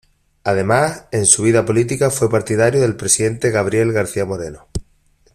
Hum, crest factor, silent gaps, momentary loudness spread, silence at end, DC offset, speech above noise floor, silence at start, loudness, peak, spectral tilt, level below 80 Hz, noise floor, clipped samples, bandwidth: none; 18 dB; none; 14 LU; 0.55 s; under 0.1%; 40 dB; 0.45 s; -16 LUFS; 0 dBFS; -4.5 dB/octave; -44 dBFS; -56 dBFS; under 0.1%; 15.5 kHz